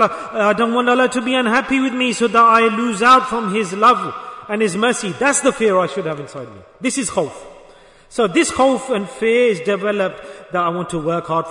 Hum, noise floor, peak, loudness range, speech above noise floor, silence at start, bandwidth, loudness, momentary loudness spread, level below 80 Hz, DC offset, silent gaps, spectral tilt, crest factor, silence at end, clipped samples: none; -45 dBFS; -2 dBFS; 6 LU; 29 dB; 0 s; 11 kHz; -16 LUFS; 13 LU; -54 dBFS; under 0.1%; none; -4 dB/octave; 14 dB; 0 s; under 0.1%